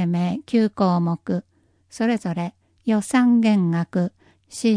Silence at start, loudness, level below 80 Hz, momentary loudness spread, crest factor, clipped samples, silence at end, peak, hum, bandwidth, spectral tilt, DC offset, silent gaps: 0 s; -21 LUFS; -64 dBFS; 11 LU; 14 dB; under 0.1%; 0 s; -8 dBFS; none; 10.5 kHz; -7 dB/octave; under 0.1%; none